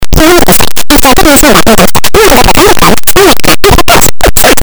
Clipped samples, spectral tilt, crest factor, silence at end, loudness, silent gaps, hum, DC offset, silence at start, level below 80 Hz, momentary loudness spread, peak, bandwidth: 20%; -3 dB/octave; 6 dB; 0 s; -3 LUFS; none; none; 60%; 0 s; -14 dBFS; 3 LU; 0 dBFS; over 20 kHz